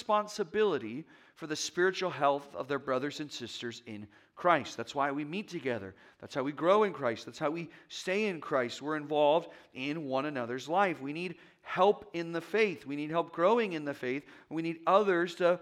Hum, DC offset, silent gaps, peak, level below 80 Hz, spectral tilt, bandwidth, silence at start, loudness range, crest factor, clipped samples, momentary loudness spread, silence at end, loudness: none; under 0.1%; none; -10 dBFS; -80 dBFS; -4.5 dB/octave; 14 kHz; 0 s; 3 LU; 22 dB; under 0.1%; 13 LU; 0 s; -32 LUFS